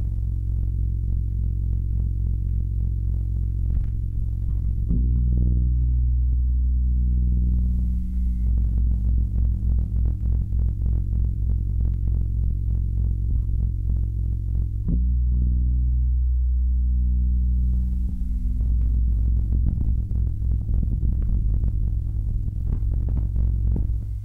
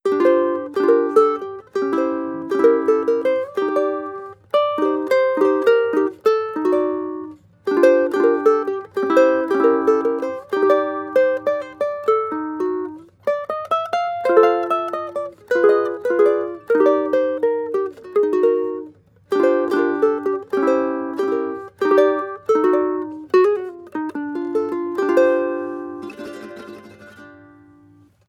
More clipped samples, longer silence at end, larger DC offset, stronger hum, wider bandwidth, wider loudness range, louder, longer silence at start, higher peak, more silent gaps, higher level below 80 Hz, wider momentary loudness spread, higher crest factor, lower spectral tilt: neither; second, 0 s vs 0.95 s; neither; neither; second, 0.9 kHz vs 12 kHz; about the same, 3 LU vs 3 LU; second, -25 LUFS vs -19 LUFS; about the same, 0 s vs 0.05 s; second, -8 dBFS vs -2 dBFS; neither; first, -22 dBFS vs -70 dBFS; second, 4 LU vs 12 LU; second, 12 dB vs 18 dB; first, -12 dB/octave vs -5.5 dB/octave